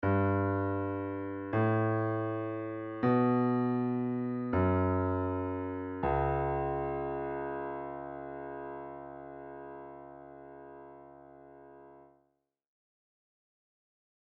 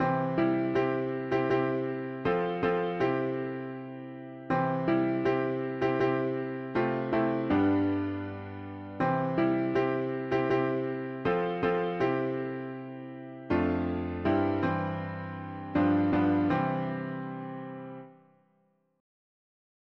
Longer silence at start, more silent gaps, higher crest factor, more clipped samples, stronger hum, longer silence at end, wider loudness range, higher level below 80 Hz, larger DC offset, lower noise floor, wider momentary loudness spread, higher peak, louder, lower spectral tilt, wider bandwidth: about the same, 0 s vs 0 s; neither; about the same, 16 dB vs 14 dB; neither; neither; first, 2.2 s vs 1.85 s; first, 19 LU vs 3 LU; about the same, -54 dBFS vs -58 dBFS; neither; first, -78 dBFS vs -71 dBFS; first, 21 LU vs 14 LU; about the same, -18 dBFS vs -16 dBFS; second, -33 LUFS vs -30 LUFS; about the same, -8.5 dB/octave vs -9 dB/octave; second, 4.4 kHz vs 6.2 kHz